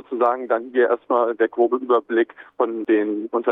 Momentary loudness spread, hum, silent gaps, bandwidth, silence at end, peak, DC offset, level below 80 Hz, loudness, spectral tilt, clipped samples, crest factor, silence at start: 5 LU; none; none; 3.9 kHz; 0 s; -6 dBFS; under 0.1%; -76 dBFS; -21 LUFS; -7.5 dB/octave; under 0.1%; 14 dB; 0.1 s